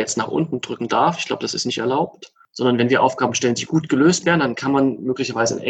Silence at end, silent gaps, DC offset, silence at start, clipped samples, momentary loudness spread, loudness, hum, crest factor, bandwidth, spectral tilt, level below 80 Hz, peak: 0 s; none; under 0.1%; 0 s; under 0.1%; 7 LU; -19 LUFS; none; 16 dB; 9.2 kHz; -4.5 dB/octave; -60 dBFS; -2 dBFS